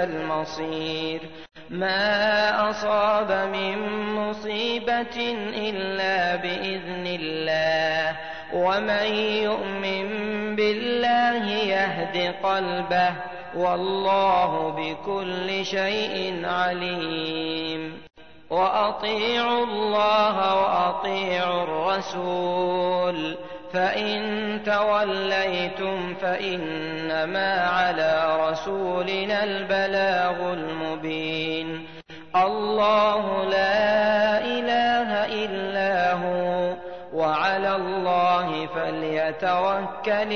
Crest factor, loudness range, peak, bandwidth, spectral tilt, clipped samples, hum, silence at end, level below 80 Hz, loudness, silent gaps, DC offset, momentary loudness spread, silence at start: 16 dB; 3 LU; -8 dBFS; 6.6 kHz; -5 dB/octave; under 0.1%; none; 0 s; -58 dBFS; -24 LUFS; none; 0.4%; 8 LU; 0 s